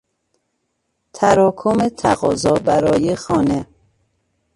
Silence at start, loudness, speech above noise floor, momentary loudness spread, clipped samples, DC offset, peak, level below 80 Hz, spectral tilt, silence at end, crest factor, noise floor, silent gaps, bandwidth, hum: 1.15 s; -17 LUFS; 56 dB; 5 LU; under 0.1%; under 0.1%; 0 dBFS; -46 dBFS; -6 dB/octave; 0.9 s; 18 dB; -71 dBFS; none; 11.5 kHz; none